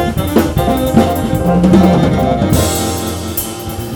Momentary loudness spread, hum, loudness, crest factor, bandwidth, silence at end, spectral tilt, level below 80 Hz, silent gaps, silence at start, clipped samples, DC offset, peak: 10 LU; none; -13 LUFS; 12 dB; over 20 kHz; 0 s; -6 dB/octave; -26 dBFS; none; 0 s; under 0.1%; under 0.1%; 0 dBFS